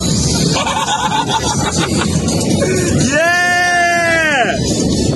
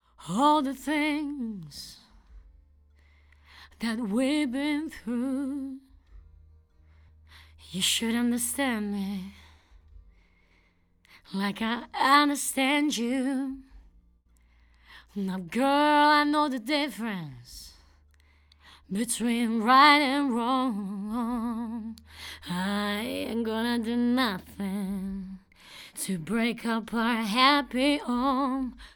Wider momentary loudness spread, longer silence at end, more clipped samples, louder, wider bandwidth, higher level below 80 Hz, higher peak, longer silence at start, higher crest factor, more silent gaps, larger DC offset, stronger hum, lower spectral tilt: second, 4 LU vs 18 LU; about the same, 0 s vs 0.1 s; neither; first, -13 LUFS vs -27 LUFS; second, 12.5 kHz vs over 20 kHz; first, -32 dBFS vs -58 dBFS; first, 0 dBFS vs -6 dBFS; second, 0 s vs 0.2 s; second, 12 dB vs 22 dB; neither; neither; neither; about the same, -3.5 dB/octave vs -3.5 dB/octave